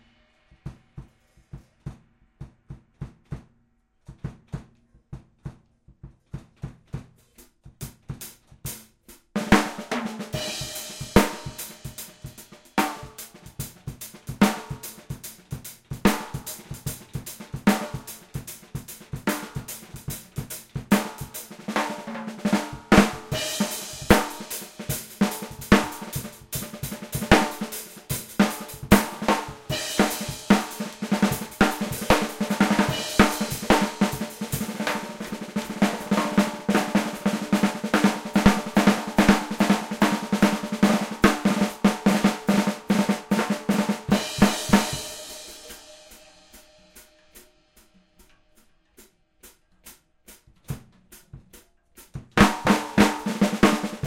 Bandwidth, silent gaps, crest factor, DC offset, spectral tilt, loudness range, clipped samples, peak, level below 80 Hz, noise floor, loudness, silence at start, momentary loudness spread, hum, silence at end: 17 kHz; none; 24 dB; under 0.1%; -4.5 dB/octave; 21 LU; under 0.1%; 0 dBFS; -42 dBFS; -66 dBFS; -24 LUFS; 0.65 s; 20 LU; none; 0 s